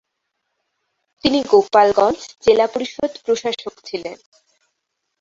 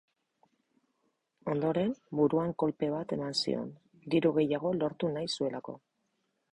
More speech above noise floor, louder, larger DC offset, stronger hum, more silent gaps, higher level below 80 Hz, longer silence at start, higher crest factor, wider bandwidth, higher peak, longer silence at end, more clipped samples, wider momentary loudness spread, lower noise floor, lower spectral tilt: first, 58 dB vs 48 dB; first, -17 LUFS vs -31 LUFS; neither; neither; neither; first, -56 dBFS vs -68 dBFS; second, 1.25 s vs 1.45 s; about the same, 18 dB vs 18 dB; second, 7.8 kHz vs 11 kHz; first, -2 dBFS vs -14 dBFS; first, 1.05 s vs 0.75 s; neither; about the same, 15 LU vs 14 LU; second, -75 dBFS vs -79 dBFS; second, -4 dB/octave vs -6 dB/octave